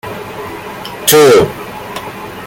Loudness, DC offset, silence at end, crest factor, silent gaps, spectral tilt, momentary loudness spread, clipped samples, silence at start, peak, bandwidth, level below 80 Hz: -8 LUFS; under 0.1%; 0 s; 14 dB; none; -3.5 dB/octave; 19 LU; under 0.1%; 0.05 s; 0 dBFS; 17 kHz; -44 dBFS